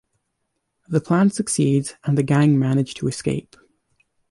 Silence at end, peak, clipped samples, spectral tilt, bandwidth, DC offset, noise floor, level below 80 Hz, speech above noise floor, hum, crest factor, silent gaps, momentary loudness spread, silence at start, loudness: 0.9 s; -6 dBFS; under 0.1%; -6.5 dB/octave; 11.5 kHz; under 0.1%; -75 dBFS; -56 dBFS; 56 dB; none; 16 dB; none; 8 LU; 0.9 s; -20 LUFS